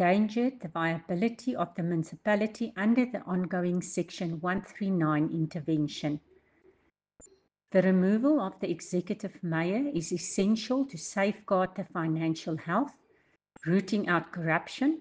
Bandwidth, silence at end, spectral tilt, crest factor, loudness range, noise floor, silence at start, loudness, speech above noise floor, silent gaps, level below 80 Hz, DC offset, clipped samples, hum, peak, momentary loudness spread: 9.8 kHz; 0 s; -6 dB/octave; 18 dB; 3 LU; -69 dBFS; 0 s; -30 LUFS; 40 dB; none; -68 dBFS; under 0.1%; under 0.1%; none; -10 dBFS; 7 LU